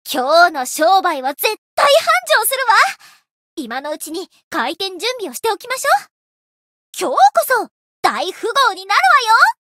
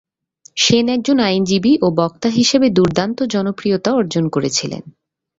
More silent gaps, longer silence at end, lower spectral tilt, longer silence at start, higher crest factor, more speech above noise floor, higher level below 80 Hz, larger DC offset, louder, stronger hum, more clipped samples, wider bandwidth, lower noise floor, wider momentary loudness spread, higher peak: first, 1.58-1.77 s, 3.31-3.57 s, 4.43-4.51 s, 6.11-6.93 s, 7.71-8.03 s vs none; second, 0.2 s vs 0.5 s; second, 0 dB/octave vs -4.5 dB/octave; second, 0.05 s vs 0.55 s; about the same, 16 dB vs 14 dB; first, over 75 dB vs 35 dB; second, -72 dBFS vs -50 dBFS; neither; about the same, -15 LUFS vs -16 LUFS; neither; neither; first, 16.5 kHz vs 8 kHz; first, under -90 dBFS vs -50 dBFS; first, 14 LU vs 6 LU; about the same, 0 dBFS vs -2 dBFS